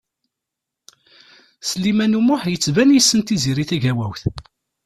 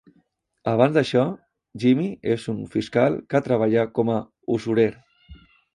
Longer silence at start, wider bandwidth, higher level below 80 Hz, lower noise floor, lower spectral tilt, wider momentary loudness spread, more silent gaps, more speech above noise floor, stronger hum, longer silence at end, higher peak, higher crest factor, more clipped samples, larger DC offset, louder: first, 1.65 s vs 0.65 s; first, 14 kHz vs 11 kHz; first, -48 dBFS vs -58 dBFS; first, -83 dBFS vs -65 dBFS; second, -4.5 dB/octave vs -7.5 dB/octave; first, 13 LU vs 8 LU; neither; first, 66 dB vs 44 dB; neither; about the same, 0.45 s vs 0.4 s; about the same, -2 dBFS vs -4 dBFS; about the same, 18 dB vs 20 dB; neither; neither; first, -17 LUFS vs -22 LUFS